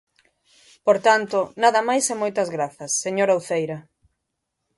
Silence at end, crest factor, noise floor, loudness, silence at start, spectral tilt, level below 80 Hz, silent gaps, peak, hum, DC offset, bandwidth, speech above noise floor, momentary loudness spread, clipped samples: 0.95 s; 20 dB; -79 dBFS; -21 LUFS; 0.85 s; -3 dB/octave; -70 dBFS; none; -4 dBFS; none; under 0.1%; 11.5 kHz; 58 dB; 8 LU; under 0.1%